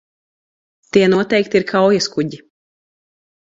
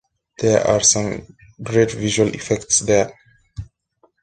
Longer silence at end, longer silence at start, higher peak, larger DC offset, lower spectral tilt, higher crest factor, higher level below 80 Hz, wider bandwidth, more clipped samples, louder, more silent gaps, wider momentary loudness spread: first, 1.1 s vs 0.6 s; first, 0.95 s vs 0.4 s; about the same, 0 dBFS vs -2 dBFS; neither; first, -5 dB/octave vs -3.5 dB/octave; about the same, 18 dB vs 18 dB; second, -58 dBFS vs -46 dBFS; second, 7.8 kHz vs 10.5 kHz; neither; about the same, -16 LUFS vs -18 LUFS; neither; second, 8 LU vs 22 LU